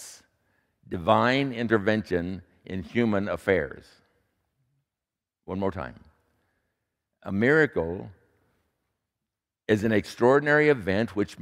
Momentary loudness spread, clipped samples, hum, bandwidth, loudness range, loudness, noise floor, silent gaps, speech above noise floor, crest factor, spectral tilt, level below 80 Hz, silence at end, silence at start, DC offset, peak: 17 LU; under 0.1%; none; 14.5 kHz; 10 LU; -25 LUFS; -89 dBFS; none; 64 dB; 22 dB; -6.5 dB/octave; -56 dBFS; 0 s; 0 s; under 0.1%; -6 dBFS